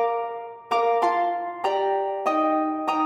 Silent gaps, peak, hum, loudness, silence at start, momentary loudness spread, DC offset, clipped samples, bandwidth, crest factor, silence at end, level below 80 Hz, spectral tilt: none; -10 dBFS; none; -24 LUFS; 0 s; 6 LU; under 0.1%; under 0.1%; 10.5 kHz; 14 dB; 0 s; -74 dBFS; -4 dB/octave